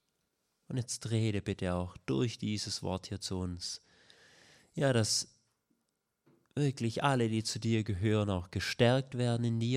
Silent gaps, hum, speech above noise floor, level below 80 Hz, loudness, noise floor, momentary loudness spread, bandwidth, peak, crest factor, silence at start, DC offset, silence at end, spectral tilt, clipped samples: none; none; 50 dB; -66 dBFS; -33 LUFS; -82 dBFS; 10 LU; 14 kHz; -14 dBFS; 20 dB; 0.7 s; under 0.1%; 0 s; -5 dB/octave; under 0.1%